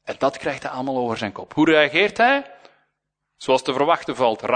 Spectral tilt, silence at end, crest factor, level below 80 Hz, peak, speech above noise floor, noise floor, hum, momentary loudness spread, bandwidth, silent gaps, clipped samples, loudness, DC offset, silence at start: -4.5 dB/octave; 0 s; 20 dB; -62 dBFS; -2 dBFS; 57 dB; -77 dBFS; none; 11 LU; 9.6 kHz; none; under 0.1%; -20 LUFS; under 0.1%; 0.05 s